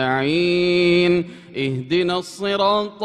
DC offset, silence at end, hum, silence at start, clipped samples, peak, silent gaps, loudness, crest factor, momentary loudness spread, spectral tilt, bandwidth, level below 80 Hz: under 0.1%; 0 s; none; 0 s; under 0.1%; -4 dBFS; none; -19 LUFS; 14 dB; 9 LU; -6 dB/octave; 10.5 kHz; -54 dBFS